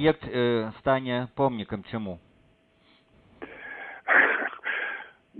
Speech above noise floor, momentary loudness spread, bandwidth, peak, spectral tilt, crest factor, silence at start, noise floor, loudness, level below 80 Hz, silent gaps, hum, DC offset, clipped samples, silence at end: 35 dB; 20 LU; 4.5 kHz; -6 dBFS; -9 dB/octave; 22 dB; 0 s; -62 dBFS; -26 LUFS; -58 dBFS; none; none; under 0.1%; under 0.1%; 0 s